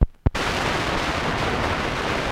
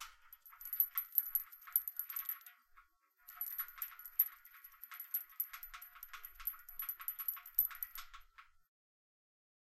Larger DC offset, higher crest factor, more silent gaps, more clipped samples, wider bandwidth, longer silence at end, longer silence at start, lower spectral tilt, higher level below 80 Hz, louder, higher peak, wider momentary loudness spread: neither; second, 20 dB vs 30 dB; neither; neither; about the same, 16 kHz vs 16 kHz; second, 0 s vs 1.25 s; about the same, 0 s vs 0 s; first, -4.5 dB/octave vs 3 dB/octave; first, -30 dBFS vs -70 dBFS; first, -23 LUFS vs -39 LUFS; first, -2 dBFS vs -14 dBFS; second, 1 LU vs 20 LU